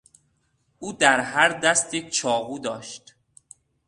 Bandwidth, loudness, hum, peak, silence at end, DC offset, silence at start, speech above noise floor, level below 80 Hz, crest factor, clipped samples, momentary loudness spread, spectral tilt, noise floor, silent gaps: 11.5 kHz; -21 LUFS; none; -2 dBFS; 0.9 s; under 0.1%; 0.8 s; 46 dB; -64 dBFS; 24 dB; under 0.1%; 19 LU; -1.5 dB/octave; -69 dBFS; none